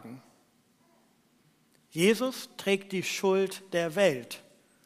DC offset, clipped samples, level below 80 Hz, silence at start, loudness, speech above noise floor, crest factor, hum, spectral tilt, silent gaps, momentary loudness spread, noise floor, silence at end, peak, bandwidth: under 0.1%; under 0.1%; -82 dBFS; 0.05 s; -29 LUFS; 38 dB; 20 dB; none; -4.5 dB/octave; none; 18 LU; -66 dBFS; 0.45 s; -10 dBFS; 15.5 kHz